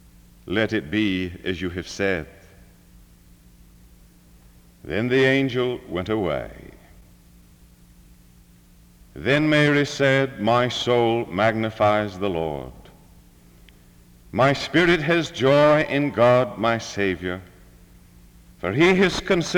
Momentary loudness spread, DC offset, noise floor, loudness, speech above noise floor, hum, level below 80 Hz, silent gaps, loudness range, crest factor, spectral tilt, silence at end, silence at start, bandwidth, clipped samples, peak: 12 LU; under 0.1%; -51 dBFS; -21 LUFS; 31 dB; none; -50 dBFS; none; 11 LU; 18 dB; -5.5 dB/octave; 0 s; 0.45 s; 19.5 kHz; under 0.1%; -4 dBFS